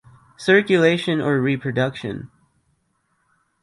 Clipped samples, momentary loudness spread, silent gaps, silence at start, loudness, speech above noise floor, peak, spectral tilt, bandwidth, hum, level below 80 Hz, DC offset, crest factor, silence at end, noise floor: under 0.1%; 15 LU; none; 0.4 s; -19 LUFS; 49 dB; -2 dBFS; -6.5 dB/octave; 11.5 kHz; none; -60 dBFS; under 0.1%; 20 dB; 1.35 s; -68 dBFS